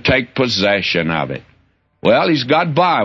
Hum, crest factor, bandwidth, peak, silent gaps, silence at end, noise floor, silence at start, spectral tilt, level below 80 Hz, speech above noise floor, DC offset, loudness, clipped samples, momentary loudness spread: none; 16 dB; 7.6 kHz; 0 dBFS; none; 0 s; -57 dBFS; 0.05 s; -5.5 dB/octave; -46 dBFS; 42 dB; under 0.1%; -15 LUFS; under 0.1%; 7 LU